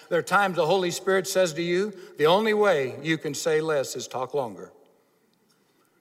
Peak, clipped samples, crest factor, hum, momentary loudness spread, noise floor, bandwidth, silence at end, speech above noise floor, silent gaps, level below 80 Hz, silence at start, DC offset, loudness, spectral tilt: -8 dBFS; under 0.1%; 18 dB; none; 10 LU; -66 dBFS; 16 kHz; 1.35 s; 41 dB; none; -74 dBFS; 0.1 s; under 0.1%; -24 LUFS; -4 dB/octave